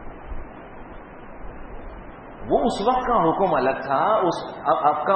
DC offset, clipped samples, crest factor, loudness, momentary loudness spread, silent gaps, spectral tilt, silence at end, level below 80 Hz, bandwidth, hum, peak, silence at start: under 0.1%; under 0.1%; 18 dB; -21 LUFS; 21 LU; none; -6 dB/octave; 0 s; -40 dBFS; 9.2 kHz; none; -6 dBFS; 0 s